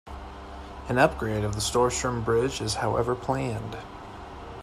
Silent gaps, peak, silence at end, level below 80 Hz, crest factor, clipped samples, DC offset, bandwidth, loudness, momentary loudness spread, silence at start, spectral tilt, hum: none; -6 dBFS; 0 s; -44 dBFS; 22 dB; under 0.1%; under 0.1%; 14.5 kHz; -26 LUFS; 18 LU; 0.05 s; -4.5 dB/octave; none